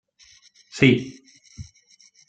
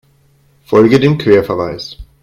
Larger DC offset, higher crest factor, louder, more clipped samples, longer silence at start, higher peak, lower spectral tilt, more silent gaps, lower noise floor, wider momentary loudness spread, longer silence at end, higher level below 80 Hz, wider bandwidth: neither; first, 24 dB vs 14 dB; second, -19 LUFS vs -11 LUFS; neither; about the same, 0.75 s vs 0.7 s; about the same, -2 dBFS vs 0 dBFS; second, -6 dB/octave vs -7.5 dB/octave; neither; first, -56 dBFS vs -52 dBFS; first, 25 LU vs 15 LU; first, 0.65 s vs 0.2 s; second, -56 dBFS vs -40 dBFS; second, 9 kHz vs 13.5 kHz